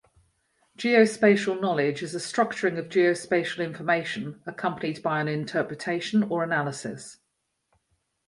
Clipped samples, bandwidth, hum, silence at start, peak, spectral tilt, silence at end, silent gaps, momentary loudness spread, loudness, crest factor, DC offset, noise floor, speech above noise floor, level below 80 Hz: under 0.1%; 11.5 kHz; none; 0.8 s; -6 dBFS; -5.5 dB/octave; 1.15 s; none; 12 LU; -25 LUFS; 20 dB; under 0.1%; -78 dBFS; 52 dB; -70 dBFS